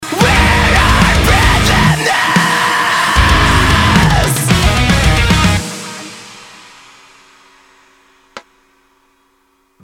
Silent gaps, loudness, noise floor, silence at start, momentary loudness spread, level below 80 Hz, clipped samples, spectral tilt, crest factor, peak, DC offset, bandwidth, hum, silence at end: none; -10 LUFS; -57 dBFS; 0 s; 8 LU; -20 dBFS; under 0.1%; -4 dB/octave; 12 dB; 0 dBFS; under 0.1%; 18 kHz; none; 1.45 s